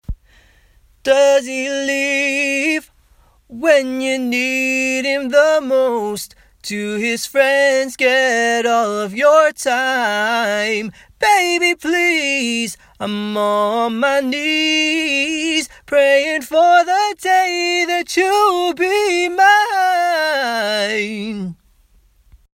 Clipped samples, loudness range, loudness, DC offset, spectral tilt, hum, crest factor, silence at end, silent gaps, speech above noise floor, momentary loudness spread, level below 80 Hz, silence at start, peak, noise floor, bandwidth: under 0.1%; 3 LU; -15 LUFS; under 0.1%; -2.5 dB/octave; none; 16 dB; 1 s; none; 37 dB; 10 LU; -48 dBFS; 0.1 s; 0 dBFS; -53 dBFS; 16.5 kHz